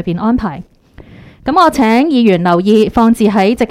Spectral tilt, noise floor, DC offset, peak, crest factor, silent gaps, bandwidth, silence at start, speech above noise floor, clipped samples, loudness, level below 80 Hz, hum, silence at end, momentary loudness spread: -6.5 dB/octave; -38 dBFS; under 0.1%; 0 dBFS; 12 dB; none; 15 kHz; 0 s; 28 dB; under 0.1%; -11 LUFS; -36 dBFS; none; 0.05 s; 9 LU